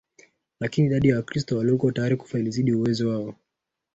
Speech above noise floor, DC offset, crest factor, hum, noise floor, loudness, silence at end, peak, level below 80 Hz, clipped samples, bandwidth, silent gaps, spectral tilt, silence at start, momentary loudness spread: 60 dB; under 0.1%; 18 dB; none; -83 dBFS; -24 LUFS; 0.6 s; -6 dBFS; -54 dBFS; under 0.1%; 8 kHz; none; -7.5 dB/octave; 0.6 s; 8 LU